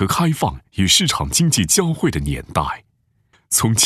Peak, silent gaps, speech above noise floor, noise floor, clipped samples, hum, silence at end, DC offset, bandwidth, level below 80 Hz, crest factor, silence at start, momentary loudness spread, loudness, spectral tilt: -2 dBFS; none; 43 dB; -61 dBFS; under 0.1%; none; 0 s; under 0.1%; 14 kHz; -38 dBFS; 18 dB; 0 s; 9 LU; -17 LUFS; -3.5 dB/octave